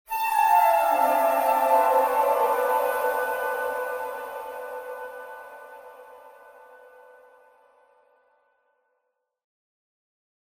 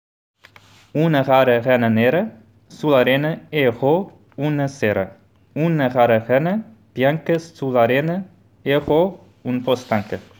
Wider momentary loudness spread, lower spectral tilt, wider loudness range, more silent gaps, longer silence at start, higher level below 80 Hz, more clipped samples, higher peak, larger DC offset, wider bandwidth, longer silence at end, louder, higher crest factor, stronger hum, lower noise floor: first, 21 LU vs 12 LU; second, -1.5 dB/octave vs -7.5 dB/octave; first, 21 LU vs 3 LU; neither; second, 0.1 s vs 0.95 s; second, -70 dBFS vs -58 dBFS; neither; second, -8 dBFS vs -2 dBFS; neither; second, 17 kHz vs over 20 kHz; first, 4.2 s vs 0.2 s; second, -23 LUFS vs -19 LUFS; about the same, 18 dB vs 16 dB; neither; first, -78 dBFS vs -49 dBFS